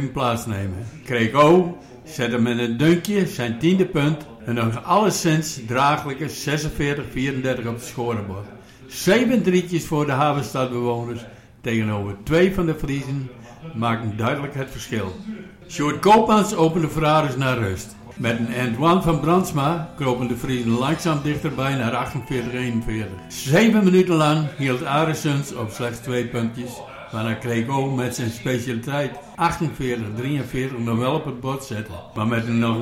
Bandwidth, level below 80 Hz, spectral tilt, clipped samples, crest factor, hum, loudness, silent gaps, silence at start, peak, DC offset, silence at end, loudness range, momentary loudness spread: 16.5 kHz; -44 dBFS; -6 dB/octave; under 0.1%; 16 dB; none; -21 LUFS; none; 0 s; -6 dBFS; under 0.1%; 0 s; 5 LU; 12 LU